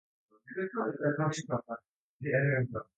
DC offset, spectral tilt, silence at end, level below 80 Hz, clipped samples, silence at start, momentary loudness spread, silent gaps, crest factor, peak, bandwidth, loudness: under 0.1%; -6.5 dB/octave; 0.15 s; -68 dBFS; under 0.1%; 0.45 s; 14 LU; 1.89-2.20 s; 18 dB; -16 dBFS; 9 kHz; -33 LUFS